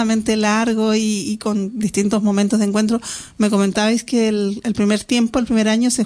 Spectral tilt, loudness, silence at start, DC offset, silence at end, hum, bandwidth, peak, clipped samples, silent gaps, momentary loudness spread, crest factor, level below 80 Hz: -4.5 dB/octave; -18 LUFS; 0 s; under 0.1%; 0 s; none; 11 kHz; -2 dBFS; under 0.1%; none; 5 LU; 16 dB; -48 dBFS